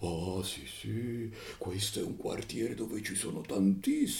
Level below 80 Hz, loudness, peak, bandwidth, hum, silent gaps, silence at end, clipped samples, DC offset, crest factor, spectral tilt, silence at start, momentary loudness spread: -60 dBFS; -35 LUFS; -18 dBFS; 18 kHz; none; none; 0 s; under 0.1%; under 0.1%; 16 dB; -4.5 dB/octave; 0 s; 10 LU